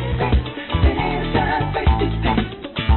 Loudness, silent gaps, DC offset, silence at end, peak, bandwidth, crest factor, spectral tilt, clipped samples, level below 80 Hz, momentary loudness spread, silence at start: -20 LUFS; none; under 0.1%; 0 s; -6 dBFS; 4.4 kHz; 12 dB; -11.5 dB/octave; under 0.1%; -22 dBFS; 5 LU; 0 s